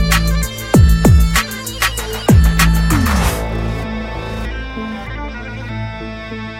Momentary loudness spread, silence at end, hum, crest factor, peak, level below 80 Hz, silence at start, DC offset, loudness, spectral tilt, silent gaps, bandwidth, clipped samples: 15 LU; 0 s; none; 14 dB; 0 dBFS; -18 dBFS; 0 s; under 0.1%; -16 LUFS; -5 dB/octave; none; 16.5 kHz; under 0.1%